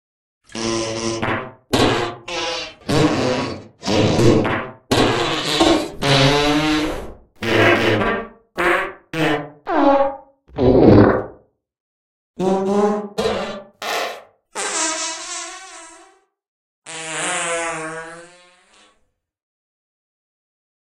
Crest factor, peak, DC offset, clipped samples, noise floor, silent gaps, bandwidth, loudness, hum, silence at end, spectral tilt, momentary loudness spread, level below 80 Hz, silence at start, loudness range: 20 dB; 0 dBFS; under 0.1%; under 0.1%; -66 dBFS; 11.80-12.34 s, 16.48-16.82 s; 16 kHz; -18 LUFS; none; 2.55 s; -4.5 dB/octave; 16 LU; -40 dBFS; 0.55 s; 10 LU